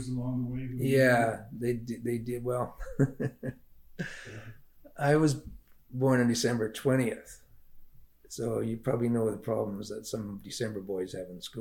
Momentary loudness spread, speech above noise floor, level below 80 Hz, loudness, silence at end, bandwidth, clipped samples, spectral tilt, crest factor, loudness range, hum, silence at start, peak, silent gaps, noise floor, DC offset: 15 LU; 22 dB; -54 dBFS; -31 LUFS; 0 s; 17.5 kHz; under 0.1%; -6 dB/octave; 18 dB; 5 LU; none; 0 s; -12 dBFS; none; -52 dBFS; under 0.1%